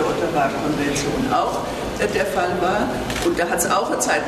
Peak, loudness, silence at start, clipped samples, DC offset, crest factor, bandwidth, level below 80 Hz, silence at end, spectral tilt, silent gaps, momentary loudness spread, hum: -6 dBFS; -21 LUFS; 0 s; under 0.1%; under 0.1%; 14 dB; 13.5 kHz; -40 dBFS; 0 s; -4 dB/octave; none; 4 LU; none